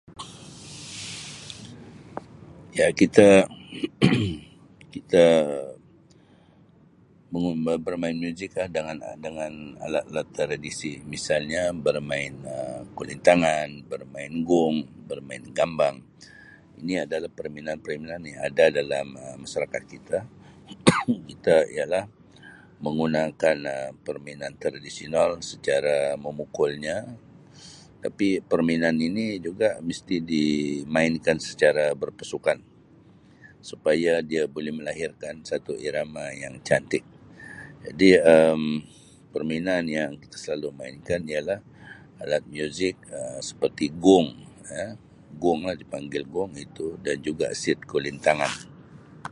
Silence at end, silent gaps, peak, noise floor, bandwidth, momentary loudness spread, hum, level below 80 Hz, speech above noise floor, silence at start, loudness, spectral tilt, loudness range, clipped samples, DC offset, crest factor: 0.05 s; none; 0 dBFS; -55 dBFS; 11.5 kHz; 17 LU; none; -56 dBFS; 31 dB; 0.1 s; -25 LUFS; -5 dB/octave; 8 LU; under 0.1%; under 0.1%; 26 dB